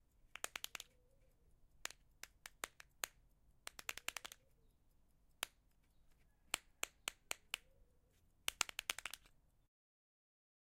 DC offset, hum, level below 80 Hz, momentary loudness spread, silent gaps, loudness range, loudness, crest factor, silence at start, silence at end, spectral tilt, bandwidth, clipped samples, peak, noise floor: under 0.1%; none; -74 dBFS; 15 LU; none; 6 LU; -48 LUFS; 40 dB; 0.25 s; 1.5 s; 1 dB/octave; 16.5 kHz; under 0.1%; -14 dBFS; -74 dBFS